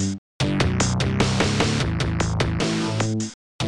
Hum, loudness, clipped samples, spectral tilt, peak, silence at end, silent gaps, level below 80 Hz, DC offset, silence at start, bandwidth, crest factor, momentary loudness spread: none; -23 LUFS; under 0.1%; -5 dB/octave; -6 dBFS; 0 s; 0.18-0.40 s, 3.34-3.59 s; -36 dBFS; 0.2%; 0 s; 11.5 kHz; 18 dB; 6 LU